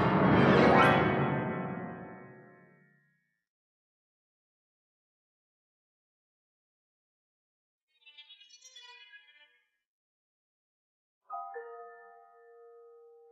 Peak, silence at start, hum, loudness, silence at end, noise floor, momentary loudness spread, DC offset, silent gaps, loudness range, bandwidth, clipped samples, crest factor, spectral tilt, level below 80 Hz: -10 dBFS; 0 s; none; -26 LUFS; 1.4 s; -76 dBFS; 28 LU; under 0.1%; 3.50-7.87 s, 9.87-11.21 s; 27 LU; 10 kHz; under 0.1%; 24 dB; -7.5 dB/octave; -60 dBFS